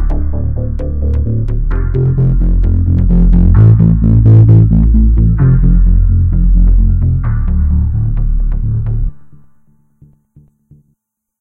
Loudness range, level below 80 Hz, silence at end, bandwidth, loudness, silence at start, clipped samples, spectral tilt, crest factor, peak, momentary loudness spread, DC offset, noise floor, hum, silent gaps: 10 LU; -12 dBFS; 2.1 s; 2.2 kHz; -11 LUFS; 0 s; 0.6%; -12.5 dB/octave; 10 dB; 0 dBFS; 10 LU; under 0.1%; -64 dBFS; none; none